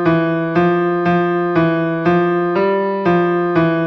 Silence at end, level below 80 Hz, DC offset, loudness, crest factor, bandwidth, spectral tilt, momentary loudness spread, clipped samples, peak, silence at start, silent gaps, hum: 0 s; -50 dBFS; under 0.1%; -16 LUFS; 12 dB; 6 kHz; -9 dB/octave; 2 LU; under 0.1%; -4 dBFS; 0 s; none; none